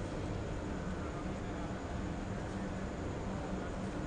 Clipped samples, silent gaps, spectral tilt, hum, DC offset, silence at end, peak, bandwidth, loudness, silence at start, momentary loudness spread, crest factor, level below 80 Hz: under 0.1%; none; -6.5 dB/octave; none; under 0.1%; 0 s; -26 dBFS; 10 kHz; -41 LUFS; 0 s; 1 LU; 12 dB; -46 dBFS